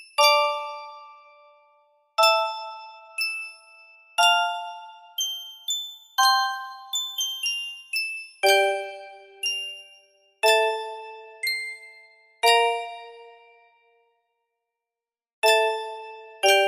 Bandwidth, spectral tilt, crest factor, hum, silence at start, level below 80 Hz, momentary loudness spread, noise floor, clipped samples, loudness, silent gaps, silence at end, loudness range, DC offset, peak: 16 kHz; 1.5 dB/octave; 20 dB; none; 0 s; -78 dBFS; 20 LU; under -90 dBFS; under 0.1%; -23 LUFS; 15.33-15.42 s; 0 s; 4 LU; under 0.1%; -6 dBFS